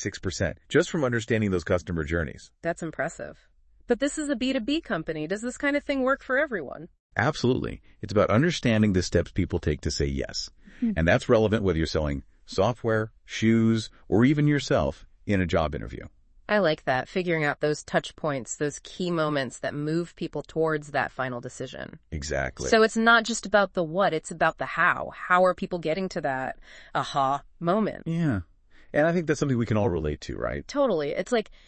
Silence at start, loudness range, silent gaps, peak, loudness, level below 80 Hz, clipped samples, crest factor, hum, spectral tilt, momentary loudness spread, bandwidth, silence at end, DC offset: 0 s; 5 LU; 6.99-7.10 s; -6 dBFS; -26 LUFS; -46 dBFS; under 0.1%; 20 dB; none; -5.5 dB/octave; 11 LU; 8.8 kHz; 0.2 s; under 0.1%